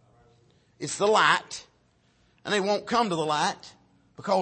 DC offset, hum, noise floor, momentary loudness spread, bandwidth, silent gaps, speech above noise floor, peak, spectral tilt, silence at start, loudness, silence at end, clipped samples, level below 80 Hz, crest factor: under 0.1%; none; -65 dBFS; 19 LU; 8.8 kHz; none; 40 dB; -6 dBFS; -3 dB/octave; 0.8 s; -25 LUFS; 0 s; under 0.1%; -70 dBFS; 22 dB